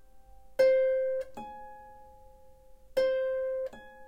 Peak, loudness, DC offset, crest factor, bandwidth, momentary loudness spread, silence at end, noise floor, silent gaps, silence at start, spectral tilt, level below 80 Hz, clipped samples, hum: -14 dBFS; -29 LUFS; under 0.1%; 18 dB; 15 kHz; 21 LU; 0 s; -54 dBFS; none; 0.15 s; -4 dB/octave; -60 dBFS; under 0.1%; none